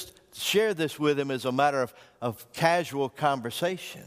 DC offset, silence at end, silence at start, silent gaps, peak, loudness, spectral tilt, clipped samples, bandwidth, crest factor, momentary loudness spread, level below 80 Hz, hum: under 0.1%; 0 s; 0 s; none; -8 dBFS; -27 LUFS; -4.5 dB/octave; under 0.1%; 15.5 kHz; 20 dB; 10 LU; -68 dBFS; none